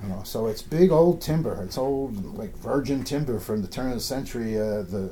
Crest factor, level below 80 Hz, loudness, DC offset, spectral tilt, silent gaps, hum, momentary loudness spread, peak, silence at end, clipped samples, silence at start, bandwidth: 18 dB; -42 dBFS; -26 LUFS; under 0.1%; -6.5 dB/octave; none; none; 11 LU; -6 dBFS; 0 s; under 0.1%; 0 s; 18 kHz